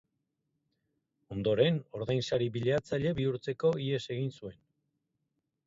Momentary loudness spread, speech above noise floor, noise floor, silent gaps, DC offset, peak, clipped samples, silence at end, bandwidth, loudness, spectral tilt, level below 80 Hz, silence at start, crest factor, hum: 10 LU; 52 dB; -83 dBFS; none; under 0.1%; -12 dBFS; under 0.1%; 1.15 s; 7.8 kHz; -32 LUFS; -7 dB/octave; -62 dBFS; 1.3 s; 20 dB; none